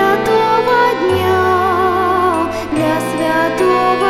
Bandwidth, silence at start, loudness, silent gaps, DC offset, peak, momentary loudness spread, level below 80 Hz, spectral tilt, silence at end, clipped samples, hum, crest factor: 15 kHz; 0 s; -14 LUFS; none; 0.3%; -2 dBFS; 4 LU; -44 dBFS; -5.5 dB/octave; 0 s; under 0.1%; none; 12 dB